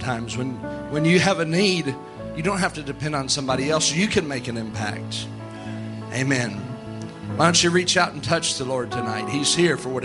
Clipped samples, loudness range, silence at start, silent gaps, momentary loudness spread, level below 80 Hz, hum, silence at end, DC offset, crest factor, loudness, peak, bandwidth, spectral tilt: under 0.1%; 4 LU; 0 s; none; 15 LU; -50 dBFS; none; 0 s; under 0.1%; 20 dB; -22 LUFS; -2 dBFS; 11.5 kHz; -4 dB/octave